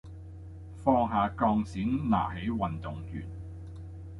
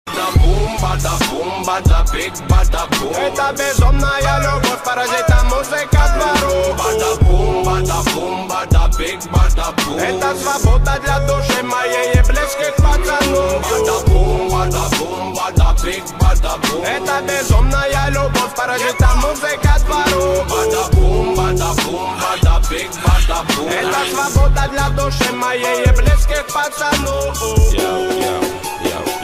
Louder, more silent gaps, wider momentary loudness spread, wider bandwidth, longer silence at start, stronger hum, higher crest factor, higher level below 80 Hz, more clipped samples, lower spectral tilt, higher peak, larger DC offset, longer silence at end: second, -30 LUFS vs -16 LUFS; neither; first, 19 LU vs 4 LU; second, 11 kHz vs 15.5 kHz; about the same, 0.05 s vs 0.05 s; neither; first, 22 dB vs 12 dB; second, -46 dBFS vs -18 dBFS; neither; first, -8.5 dB/octave vs -4.5 dB/octave; second, -10 dBFS vs -2 dBFS; neither; about the same, 0 s vs 0 s